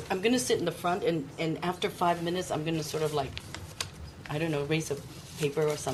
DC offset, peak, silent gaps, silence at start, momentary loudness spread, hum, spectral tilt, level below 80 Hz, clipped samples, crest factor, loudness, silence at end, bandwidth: under 0.1%; -14 dBFS; none; 0 s; 10 LU; none; -4.5 dB/octave; -56 dBFS; under 0.1%; 16 dB; -31 LUFS; 0 s; 13 kHz